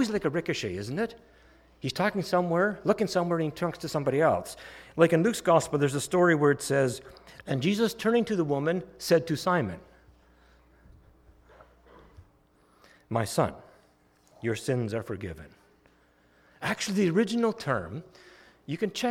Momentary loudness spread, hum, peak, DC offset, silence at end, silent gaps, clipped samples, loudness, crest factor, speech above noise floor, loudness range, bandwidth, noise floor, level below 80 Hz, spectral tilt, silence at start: 14 LU; none; -8 dBFS; under 0.1%; 0 s; none; under 0.1%; -28 LUFS; 20 dB; 36 dB; 11 LU; 17 kHz; -63 dBFS; -60 dBFS; -5.5 dB/octave; 0 s